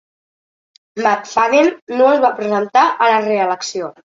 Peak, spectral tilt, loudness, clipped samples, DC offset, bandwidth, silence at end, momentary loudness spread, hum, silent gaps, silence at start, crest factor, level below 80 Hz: -2 dBFS; -4 dB/octave; -15 LUFS; under 0.1%; under 0.1%; 7.8 kHz; 0.15 s; 7 LU; none; 1.82-1.87 s; 0.95 s; 14 dB; -64 dBFS